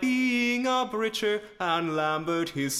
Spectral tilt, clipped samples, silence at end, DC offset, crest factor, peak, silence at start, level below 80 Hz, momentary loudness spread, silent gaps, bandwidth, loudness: -3.5 dB/octave; under 0.1%; 0 s; under 0.1%; 14 dB; -14 dBFS; 0 s; -64 dBFS; 5 LU; none; 16 kHz; -27 LUFS